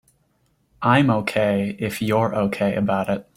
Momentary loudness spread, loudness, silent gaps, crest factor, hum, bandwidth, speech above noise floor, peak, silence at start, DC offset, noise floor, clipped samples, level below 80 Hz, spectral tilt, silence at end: 7 LU; -21 LUFS; none; 18 dB; none; 16 kHz; 45 dB; -2 dBFS; 0.8 s; under 0.1%; -65 dBFS; under 0.1%; -56 dBFS; -6.5 dB/octave; 0.15 s